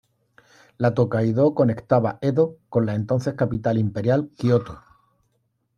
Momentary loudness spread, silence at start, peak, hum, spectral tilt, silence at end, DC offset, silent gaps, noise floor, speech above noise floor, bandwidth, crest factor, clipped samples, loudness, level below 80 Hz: 5 LU; 0.8 s; -4 dBFS; none; -9 dB/octave; 1 s; under 0.1%; none; -71 dBFS; 50 dB; 7.2 kHz; 18 dB; under 0.1%; -22 LUFS; -54 dBFS